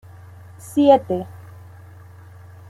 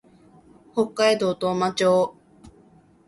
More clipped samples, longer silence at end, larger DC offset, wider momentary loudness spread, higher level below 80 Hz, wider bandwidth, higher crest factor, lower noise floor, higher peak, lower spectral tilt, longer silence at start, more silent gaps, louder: neither; first, 1.35 s vs 0.6 s; neither; first, 26 LU vs 7 LU; about the same, -62 dBFS vs -62 dBFS; first, 14 kHz vs 11.5 kHz; about the same, 20 dB vs 18 dB; second, -42 dBFS vs -55 dBFS; first, -2 dBFS vs -6 dBFS; first, -7 dB/octave vs -4.5 dB/octave; about the same, 0.65 s vs 0.75 s; neither; first, -18 LUFS vs -22 LUFS